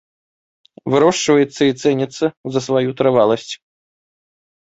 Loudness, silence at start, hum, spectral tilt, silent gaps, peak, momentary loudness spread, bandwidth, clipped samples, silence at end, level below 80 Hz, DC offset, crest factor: -16 LUFS; 0.85 s; none; -5 dB/octave; 2.37-2.44 s; -2 dBFS; 9 LU; 8 kHz; under 0.1%; 1.15 s; -60 dBFS; under 0.1%; 16 dB